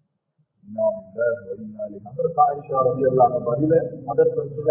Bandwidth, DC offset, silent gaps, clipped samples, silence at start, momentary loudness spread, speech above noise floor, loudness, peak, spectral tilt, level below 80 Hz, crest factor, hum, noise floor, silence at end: 2.7 kHz; under 0.1%; none; under 0.1%; 0.7 s; 14 LU; 48 dB; -21 LUFS; -6 dBFS; -14 dB/octave; -58 dBFS; 16 dB; none; -69 dBFS; 0 s